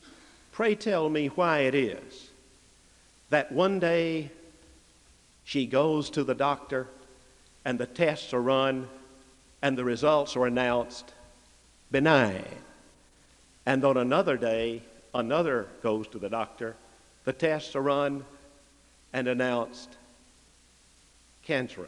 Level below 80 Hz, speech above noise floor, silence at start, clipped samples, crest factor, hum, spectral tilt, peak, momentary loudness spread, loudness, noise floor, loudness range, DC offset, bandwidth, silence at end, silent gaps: -62 dBFS; 33 dB; 0.55 s; under 0.1%; 24 dB; none; -5.5 dB/octave; -6 dBFS; 15 LU; -28 LUFS; -60 dBFS; 4 LU; under 0.1%; 11.5 kHz; 0 s; none